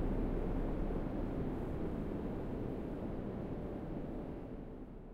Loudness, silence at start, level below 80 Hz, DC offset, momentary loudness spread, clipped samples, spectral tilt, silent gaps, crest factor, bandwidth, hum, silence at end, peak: -42 LUFS; 0 s; -44 dBFS; under 0.1%; 7 LU; under 0.1%; -9.5 dB/octave; none; 14 dB; 4.9 kHz; none; 0 s; -26 dBFS